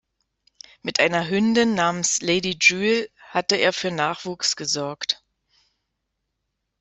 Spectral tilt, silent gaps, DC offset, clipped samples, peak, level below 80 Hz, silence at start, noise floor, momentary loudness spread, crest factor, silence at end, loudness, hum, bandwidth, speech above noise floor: -2.5 dB/octave; none; under 0.1%; under 0.1%; -2 dBFS; -64 dBFS; 0.85 s; -78 dBFS; 9 LU; 22 dB; 1.65 s; -21 LUFS; none; 8.4 kHz; 56 dB